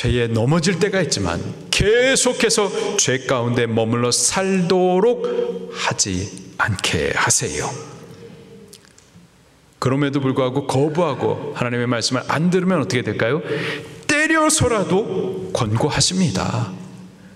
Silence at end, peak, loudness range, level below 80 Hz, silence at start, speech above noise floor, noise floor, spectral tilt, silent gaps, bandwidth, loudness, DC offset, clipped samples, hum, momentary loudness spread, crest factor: 0 s; -2 dBFS; 5 LU; -44 dBFS; 0 s; 33 dB; -52 dBFS; -4 dB/octave; none; 14.5 kHz; -19 LUFS; under 0.1%; under 0.1%; none; 9 LU; 18 dB